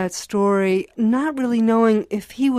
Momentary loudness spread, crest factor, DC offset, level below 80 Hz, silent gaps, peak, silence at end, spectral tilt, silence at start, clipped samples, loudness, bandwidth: 5 LU; 12 dB; under 0.1%; -60 dBFS; none; -8 dBFS; 0 s; -6 dB/octave; 0 s; under 0.1%; -19 LUFS; 14 kHz